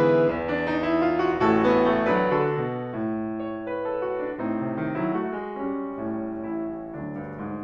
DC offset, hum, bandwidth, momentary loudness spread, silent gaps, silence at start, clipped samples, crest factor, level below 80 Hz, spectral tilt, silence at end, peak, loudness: under 0.1%; none; 6.8 kHz; 11 LU; none; 0 s; under 0.1%; 16 dB; -54 dBFS; -8.5 dB/octave; 0 s; -8 dBFS; -26 LUFS